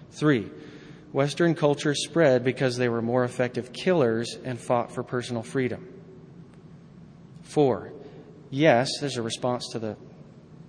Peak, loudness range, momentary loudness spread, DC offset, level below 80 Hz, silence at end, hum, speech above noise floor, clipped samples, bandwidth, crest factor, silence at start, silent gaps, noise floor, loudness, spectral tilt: -6 dBFS; 7 LU; 18 LU; under 0.1%; -64 dBFS; 0.05 s; none; 23 dB; under 0.1%; 10.5 kHz; 20 dB; 0 s; none; -48 dBFS; -26 LUFS; -5.5 dB/octave